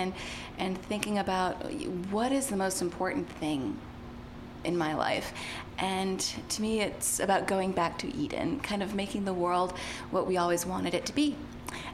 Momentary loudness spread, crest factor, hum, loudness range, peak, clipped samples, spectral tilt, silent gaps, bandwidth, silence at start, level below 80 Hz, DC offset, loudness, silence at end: 10 LU; 24 dB; none; 3 LU; -6 dBFS; under 0.1%; -4 dB/octave; none; 16 kHz; 0 s; -52 dBFS; under 0.1%; -31 LUFS; 0 s